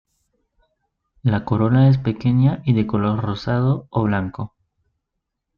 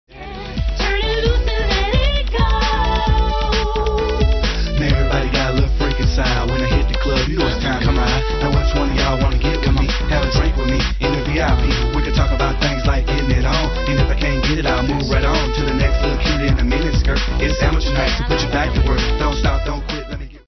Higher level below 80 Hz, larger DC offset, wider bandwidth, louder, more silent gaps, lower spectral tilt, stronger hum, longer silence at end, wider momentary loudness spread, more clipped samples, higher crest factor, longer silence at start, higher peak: second, -48 dBFS vs -18 dBFS; neither; second, 5.6 kHz vs 6.4 kHz; about the same, -19 LUFS vs -18 LUFS; neither; first, -10 dB/octave vs -5.5 dB/octave; neither; first, 1.1 s vs 0.1 s; first, 9 LU vs 2 LU; neither; about the same, 16 dB vs 14 dB; first, 1.25 s vs 0.1 s; about the same, -4 dBFS vs -2 dBFS